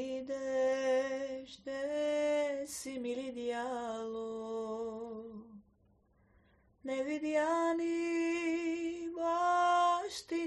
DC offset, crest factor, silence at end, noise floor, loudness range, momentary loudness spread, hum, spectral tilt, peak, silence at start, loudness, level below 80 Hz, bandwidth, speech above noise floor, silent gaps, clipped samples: under 0.1%; 16 dB; 0 s; -70 dBFS; 10 LU; 12 LU; none; -3.5 dB/octave; -20 dBFS; 0 s; -35 LUFS; -72 dBFS; 10 kHz; 35 dB; none; under 0.1%